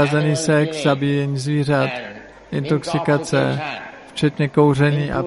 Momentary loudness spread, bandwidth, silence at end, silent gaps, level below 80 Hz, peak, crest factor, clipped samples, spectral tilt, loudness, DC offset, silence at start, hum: 12 LU; 11.5 kHz; 0 s; none; -50 dBFS; -4 dBFS; 16 dB; under 0.1%; -6 dB/octave; -19 LUFS; under 0.1%; 0 s; none